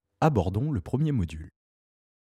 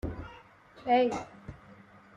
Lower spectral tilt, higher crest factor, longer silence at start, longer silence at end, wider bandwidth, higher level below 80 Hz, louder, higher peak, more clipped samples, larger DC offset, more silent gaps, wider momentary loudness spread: first, -8.5 dB/octave vs -6 dB/octave; about the same, 18 dB vs 18 dB; first, 0.2 s vs 0.05 s; first, 0.7 s vs 0.45 s; first, 10.5 kHz vs 9.2 kHz; first, -46 dBFS vs -52 dBFS; first, -27 LUFS vs -30 LUFS; first, -10 dBFS vs -16 dBFS; neither; neither; neither; second, 9 LU vs 23 LU